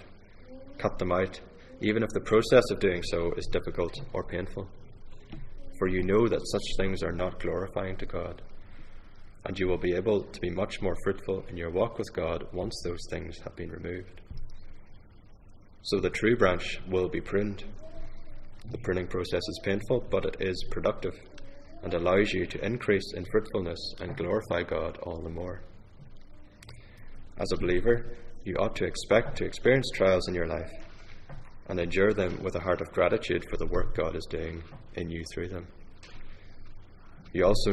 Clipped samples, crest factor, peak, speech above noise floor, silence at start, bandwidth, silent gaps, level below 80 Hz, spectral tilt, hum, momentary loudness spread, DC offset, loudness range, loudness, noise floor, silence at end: under 0.1%; 22 dB; -8 dBFS; 22 dB; 0 s; 12 kHz; none; -40 dBFS; -6 dB/octave; none; 22 LU; under 0.1%; 7 LU; -30 LUFS; -51 dBFS; 0 s